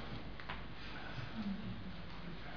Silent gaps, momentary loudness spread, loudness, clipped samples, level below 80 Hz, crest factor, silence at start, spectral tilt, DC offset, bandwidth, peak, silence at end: none; 6 LU; -47 LUFS; under 0.1%; -56 dBFS; 18 dB; 0 s; -4.5 dB/octave; 0.4%; 5.4 kHz; -28 dBFS; 0 s